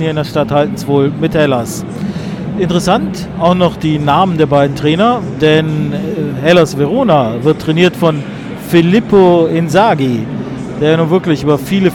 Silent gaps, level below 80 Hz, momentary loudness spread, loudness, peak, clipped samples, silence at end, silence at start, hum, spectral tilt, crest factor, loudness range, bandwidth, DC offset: none; -40 dBFS; 11 LU; -12 LUFS; 0 dBFS; under 0.1%; 0 s; 0 s; none; -6.5 dB/octave; 12 dB; 3 LU; 17 kHz; under 0.1%